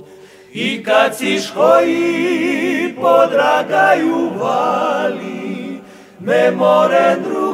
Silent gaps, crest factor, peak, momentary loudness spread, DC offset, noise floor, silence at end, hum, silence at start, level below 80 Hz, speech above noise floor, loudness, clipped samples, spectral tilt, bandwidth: none; 14 dB; 0 dBFS; 13 LU; under 0.1%; -40 dBFS; 0 s; none; 0 s; -66 dBFS; 26 dB; -14 LUFS; under 0.1%; -4.5 dB/octave; 15.5 kHz